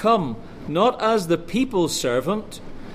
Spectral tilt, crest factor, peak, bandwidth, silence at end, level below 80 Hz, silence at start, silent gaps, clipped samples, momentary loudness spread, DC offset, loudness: -5 dB/octave; 16 dB; -6 dBFS; 15.5 kHz; 0 s; -44 dBFS; 0 s; none; under 0.1%; 13 LU; under 0.1%; -22 LUFS